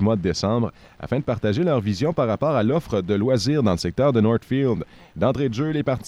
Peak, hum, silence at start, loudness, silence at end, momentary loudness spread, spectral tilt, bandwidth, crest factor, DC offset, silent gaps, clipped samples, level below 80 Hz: -6 dBFS; none; 0 s; -22 LUFS; 0 s; 5 LU; -7 dB/octave; 13 kHz; 14 dB; under 0.1%; none; under 0.1%; -48 dBFS